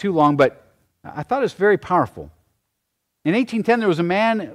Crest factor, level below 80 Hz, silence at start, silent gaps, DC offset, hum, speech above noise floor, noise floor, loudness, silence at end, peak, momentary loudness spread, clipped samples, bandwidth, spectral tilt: 16 dB; -56 dBFS; 0 s; none; under 0.1%; none; 57 dB; -76 dBFS; -19 LUFS; 0 s; -4 dBFS; 10 LU; under 0.1%; 13 kHz; -7 dB/octave